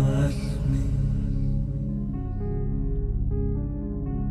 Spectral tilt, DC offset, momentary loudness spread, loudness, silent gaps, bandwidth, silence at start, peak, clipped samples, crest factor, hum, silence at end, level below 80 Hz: -8.5 dB/octave; under 0.1%; 5 LU; -28 LUFS; none; 11.5 kHz; 0 s; -12 dBFS; under 0.1%; 14 dB; 50 Hz at -35 dBFS; 0 s; -28 dBFS